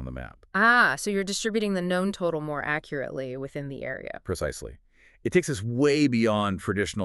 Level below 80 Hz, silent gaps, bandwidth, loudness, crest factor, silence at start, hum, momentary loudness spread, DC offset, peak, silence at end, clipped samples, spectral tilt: -50 dBFS; none; 12 kHz; -26 LUFS; 20 dB; 0 s; none; 14 LU; under 0.1%; -8 dBFS; 0 s; under 0.1%; -5 dB/octave